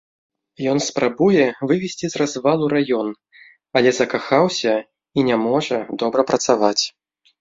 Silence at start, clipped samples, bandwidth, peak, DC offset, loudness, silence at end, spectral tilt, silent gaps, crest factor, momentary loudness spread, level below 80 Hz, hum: 0.6 s; under 0.1%; 7.8 kHz; -2 dBFS; under 0.1%; -19 LUFS; 0.5 s; -4.5 dB/octave; none; 18 dB; 7 LU; -60 dBFS; none